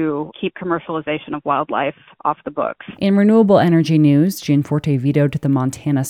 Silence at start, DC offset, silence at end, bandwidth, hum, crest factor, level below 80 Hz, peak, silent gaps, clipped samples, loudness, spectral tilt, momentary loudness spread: 0 s; under 0.1%; 0 s; 15.5 kHz; none; 16 dB; -56 dBFS; -2 dBFS; none; under 0.1%; -17 LUFS; -7.5 dB/octave; 11 LU